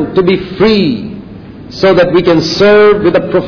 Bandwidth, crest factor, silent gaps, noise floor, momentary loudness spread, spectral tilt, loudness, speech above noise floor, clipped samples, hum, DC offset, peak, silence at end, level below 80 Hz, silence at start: 5.4 kHz; 10 dB; none; -28 dBFS; 15 LU; -6.5 dB/octave; -8 LUFS; 20 dB; under 0.1%; none; under 0.1%; 0 dBFS; 0 s; -38 dBFS; 0 s